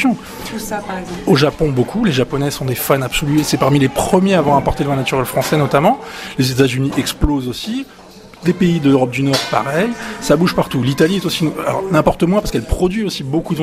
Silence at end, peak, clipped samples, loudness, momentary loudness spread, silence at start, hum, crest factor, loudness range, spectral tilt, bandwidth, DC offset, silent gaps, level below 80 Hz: 0 s; 0 dBFS; under 0.1%; -16 LUFS; 9 LU; 0 s; none; 16 dB; 2 LU; -5.5 dB/octave; 16 kHz; under 0.1%; none; -32 dBFS